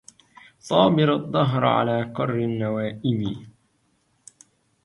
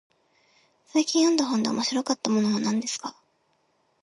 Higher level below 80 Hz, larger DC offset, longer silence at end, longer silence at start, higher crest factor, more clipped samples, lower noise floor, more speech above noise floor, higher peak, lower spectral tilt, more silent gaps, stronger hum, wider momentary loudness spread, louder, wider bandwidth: first, -58 dBFS vs -74 dBFS; neither; first, 1.35 s vs 0.9 s; second, 0.65 s vs 0.95 s; about the same, 20 dB vs 20 dB; neither; about the same, -67 dBFS vs -69 dBFS; about the same, 45 dB vs 45 dB; first, -4 dBFS vs -8 dBFS; first, -7 dB/octave vs -3.5 dB/octave; neither; neither; about the same, 9 LU vs 9 LU; first, -22 LUFS vs -25 LUFS; about the same, 11.5 kHz vs 11.5 kHz